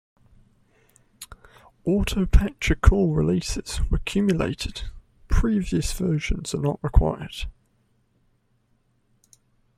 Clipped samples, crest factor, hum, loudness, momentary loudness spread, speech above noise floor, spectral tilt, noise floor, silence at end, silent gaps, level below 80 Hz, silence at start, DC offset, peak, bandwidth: under 0.1%; 22 dB; none; -24 LUFS; 17 LU; 45 dB; -6 dB/octave; -66 dBFS; 2.25 s; none; -28 dBFS; 1.2 s; under 0.1%; -2 dBFS; 15 kHz